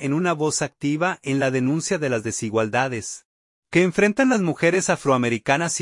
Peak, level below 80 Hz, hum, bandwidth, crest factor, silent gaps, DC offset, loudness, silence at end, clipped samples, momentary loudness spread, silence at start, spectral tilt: -4 dBFS; -60 dBFS; none; 11.5 kHz; 18 dB; 3.25-3.62 s; under 0.1%; -21 LUFS; 0 s; under 0.1%; 6 LU; 0 s; -4.5 dB/octave